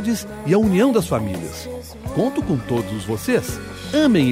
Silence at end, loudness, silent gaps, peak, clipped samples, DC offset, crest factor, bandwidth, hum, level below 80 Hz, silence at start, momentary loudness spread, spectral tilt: 0 s; -20 LUFS; none; -6 dBFS; under 0.1%; under 0.1%; 14 dB; 16 kHz; none; -42 dBFS; 0 s; 14 LU; -6 dB/octave